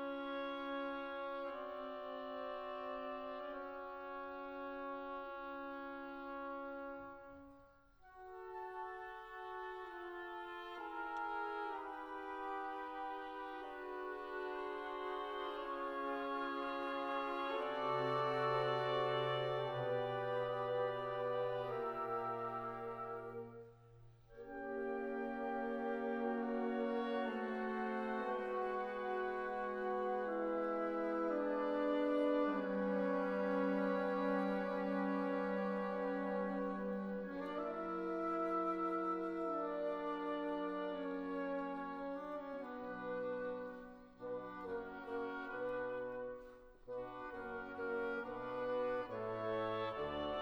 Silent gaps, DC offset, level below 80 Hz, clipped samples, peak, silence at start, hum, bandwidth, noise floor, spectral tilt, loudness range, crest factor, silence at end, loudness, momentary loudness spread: none; under 0.1%; -70 dBFS; under 0.1%; -26 dBFS; 0 s; none; 7.4 kHz; -65 dBFS; -7.5 dB/octave; 9 LU; 16 dB; 0 s; -42 LUFS; 11 LU